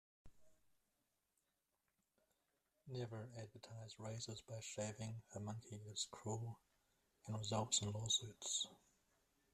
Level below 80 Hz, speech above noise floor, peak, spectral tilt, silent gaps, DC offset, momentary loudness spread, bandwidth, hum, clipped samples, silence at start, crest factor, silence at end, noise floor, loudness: -78 dBFS; 41 dB; -24 dBFS; -3 dB/octave; none; under 0.1%; 15 LU; 14 kHz; none; under 0.1%; 0.25 s; 24 dB; 0.75 s; -88 dBFS; -46 LUFS